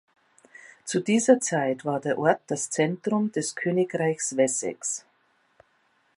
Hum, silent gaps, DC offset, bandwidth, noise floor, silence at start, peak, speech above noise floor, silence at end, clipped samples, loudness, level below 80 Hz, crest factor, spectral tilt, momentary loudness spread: none; none; under 0.1%; 11.5 kHz; -67 dBFS; 0.65 s; -6 dBFS; 42 dB; 1.2 s; under 0.1%; -25 LUFS; -76 dBFS; 22 dB; -4.5 dB/octave; 9 LU